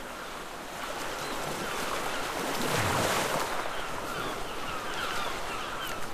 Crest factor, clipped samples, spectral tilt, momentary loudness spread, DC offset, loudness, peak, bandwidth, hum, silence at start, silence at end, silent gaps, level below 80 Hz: 18 dB; under 0.1%; -3 dB/octave; 9 LU; under 0.1%; -32 LUFS; -14 dBFS; 15.5 kHz; none; 0 s; 0 s; none; -50 dBFS